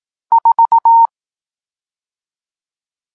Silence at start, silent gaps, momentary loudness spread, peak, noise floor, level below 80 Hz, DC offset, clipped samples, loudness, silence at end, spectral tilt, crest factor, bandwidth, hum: 0.3 s; none; 6 LU; -4 dBFS; under -90 dBFS; -82 dBFS; under 0.1%; under 0.1%; -11 LUFS; 2.1 s; -2.5 dB/octave; 12 dB; 1.8 kHz; none